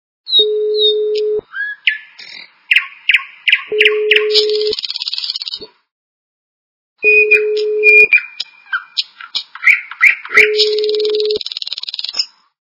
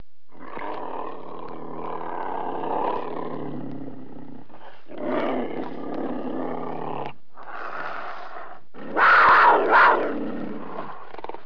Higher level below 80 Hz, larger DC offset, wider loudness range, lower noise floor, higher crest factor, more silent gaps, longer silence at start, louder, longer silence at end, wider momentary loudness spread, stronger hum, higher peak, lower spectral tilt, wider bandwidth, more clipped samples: about the same, -62 dBFS vs -62 dBFS; second, under 0.1% vs 3%; second, 4 LU vs 13 LU; second, -35 dBFS vs -47 dBFS; about the same, 16 dB vs 20 dB; first, 5.91-6.96 s vs none; about the same, 0.25 s vs 0.35 s; first, -12 LUFS vs -22 LUFS; first, 0.35 s vs 0.05 s; second, 14 LU vs 24 LU; neither; first, 0 dBFS vs -6 dBFS; second, 0 dB/octave vs -6.5 dB/octave; first, 6 kHz vs 5.4 kHz; first, 0.2% vs under 0.1%